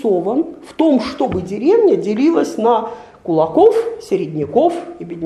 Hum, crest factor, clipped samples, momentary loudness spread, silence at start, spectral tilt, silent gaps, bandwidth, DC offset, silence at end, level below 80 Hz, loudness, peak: none; 14 dB; under 0.1%; 10 LU; 0 s; -7 dB/octave; none; 11.5 kHz; under 0.1%; 0 s; -52 dBFS; -16 LUFS; 0 dBFS